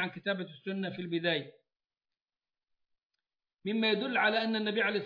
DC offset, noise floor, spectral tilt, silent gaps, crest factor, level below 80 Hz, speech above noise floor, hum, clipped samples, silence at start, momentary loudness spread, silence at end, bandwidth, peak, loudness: under 0.1%; under -90 dBFS; -7.5 dB/octave; 3.05-3.10 s; 18 dB; -90 dBFS; over 58 dB; none; under 0.1%; 0 s; 9 LU; 0 s; 5.2 kHz; -16 dBFS; -32 LUFS